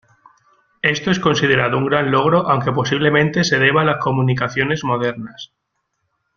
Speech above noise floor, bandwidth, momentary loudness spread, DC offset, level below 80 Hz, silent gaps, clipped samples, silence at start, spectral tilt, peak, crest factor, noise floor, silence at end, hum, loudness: 55 dB; 7.2 kHz; 6 LU; under 0.1%; -52 dBFS; none; under 0.1%; 0.85 s; -5.5 dB/octave; 0 dBFS; 18 dB; -72 dBFS; 0.9 s; none; -16 LUFS